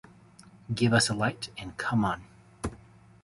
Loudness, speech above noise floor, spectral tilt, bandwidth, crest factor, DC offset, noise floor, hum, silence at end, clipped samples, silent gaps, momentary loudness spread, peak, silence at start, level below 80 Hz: -29 LUFS; 27 dB; -4.5 dB/octave; 11.5 kHz; 22 dB; under 0.1%; -54 dBFS; none; 0.45 s; under 0.1%; none; 16 LU; -10 dBFS; 0.7 s; -52 dBFS